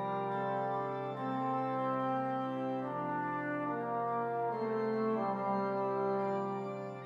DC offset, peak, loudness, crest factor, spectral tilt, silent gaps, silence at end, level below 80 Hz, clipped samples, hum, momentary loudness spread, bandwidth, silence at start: under 0.1%; -24 dBFS; -35 LUFS; 12 dB; -8.5 dB/octave; none; 0 s; -88 dBFS; under 0.1%; none; 3 LU; 7.6 kHz; 0 s